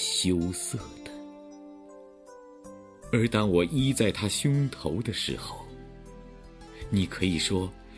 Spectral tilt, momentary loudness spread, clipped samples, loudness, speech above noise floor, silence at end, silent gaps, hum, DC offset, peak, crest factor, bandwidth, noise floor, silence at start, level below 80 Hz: -4.5 dB/octave; 23 LU; under 0.1%; -27 LUFS; 23 dB; 0 s; none; none; under 0.1%; -8 dBFS; 20 dB; 11 kHz; -50 dBFS; 0 s; -50 dBFS